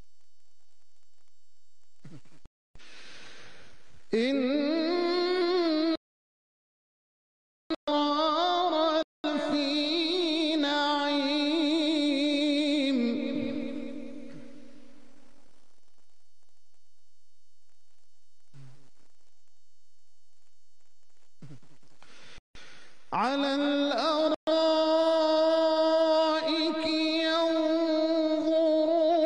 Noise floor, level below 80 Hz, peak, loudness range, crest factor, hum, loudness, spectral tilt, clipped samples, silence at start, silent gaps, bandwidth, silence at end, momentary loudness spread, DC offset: -74 dBFS; -66 dBFS; -16 dBFS; 10 LU; 14 dB; none; -27 LUFS; -4 dB/octave; under 0.1%; 0 s; 2.47-2.74 s, 5.97-7.70 s, 7.76-7.87 s, 9.04-9.24 s, 22.39-22.54 s, 24.36-24.47 s; 10 kHz; 0 s; 10 LU; 0.8%